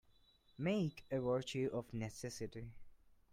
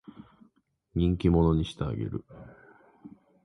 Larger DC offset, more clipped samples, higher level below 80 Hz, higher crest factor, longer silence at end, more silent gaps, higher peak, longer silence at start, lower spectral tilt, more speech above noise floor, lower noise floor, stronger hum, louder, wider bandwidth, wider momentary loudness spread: neither; neither; second, -66 dBFS vs -40 dBFS; about the same, 18 dB vs 18 dB; about the same, 0.25 s vs 0.35 s; neither; second, -26 dBFS vs -12 dBFS; second, 0.6 s vs 0.95 s; second, -6 dB/octave vs -9 dB/octave; second, 30 dB vs 41 dB; about the same, -70 dBFS vs -68 dBFS; neither; second, -42 LUFS vs -28 LUFS; first, 16 kHz vs 10.5 kHz; second, 10 LU vs 19 LU